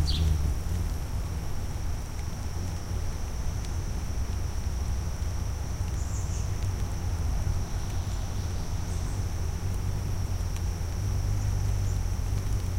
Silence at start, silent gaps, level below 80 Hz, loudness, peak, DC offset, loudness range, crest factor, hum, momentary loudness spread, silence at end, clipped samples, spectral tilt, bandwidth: 0 s; none; -32 dBFS; -32 LUFS; -14 dBFS; under 0.1%; 3 LU; 14 dB; none; 5 LU; 0 s; under 0.1%; -5.5 dB/octave; 16.5 kHz